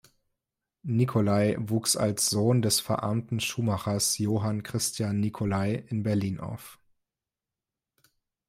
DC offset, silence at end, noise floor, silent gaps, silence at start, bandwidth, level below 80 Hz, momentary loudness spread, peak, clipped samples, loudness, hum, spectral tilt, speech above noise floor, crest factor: under 0.1%; 1.75 s; -90 dBFS; none; 0.85 s; 16 kHz; -62 dBFS; 6 LU; -12 dBFS; under 0.1%; -27 LUFS; none; -4.5 dB/octave; 63 dB; 18 dB